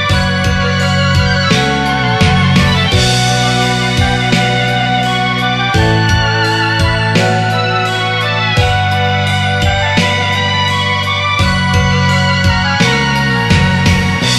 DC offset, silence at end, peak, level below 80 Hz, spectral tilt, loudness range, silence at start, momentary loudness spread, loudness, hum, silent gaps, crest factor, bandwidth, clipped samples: under 0.1%; 0 s; 0 dBFS; -28 dBFS; -4.5 dB/octave; 1 LU; 0 s; 3 LU; -11 LUFS; none; none; 12 dB; 13.5 kHz; under 0.1%